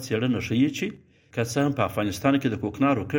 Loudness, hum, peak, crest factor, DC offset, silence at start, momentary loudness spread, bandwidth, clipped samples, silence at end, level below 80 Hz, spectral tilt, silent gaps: -25 LUFS; none; -6 dBFS; 20 dB; under 0.1%; 0 s; 8 LU; 17 kHz; under 0.1%; 0 s; -56 dBFS; -6 dB/octave; none